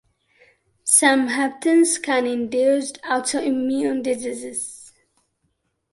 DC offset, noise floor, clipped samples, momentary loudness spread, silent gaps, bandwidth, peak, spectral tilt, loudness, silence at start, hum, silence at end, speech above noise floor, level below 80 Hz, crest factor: under 0.1%; -71 dBFS; under 0.1%; 13 LU; none; 12 kHz; 0 dBFS; -1.5 dB/octave; -20 LUFS; 0.85 s; none; 1.05 s; 51 dB; -68 dBFS; 20 dB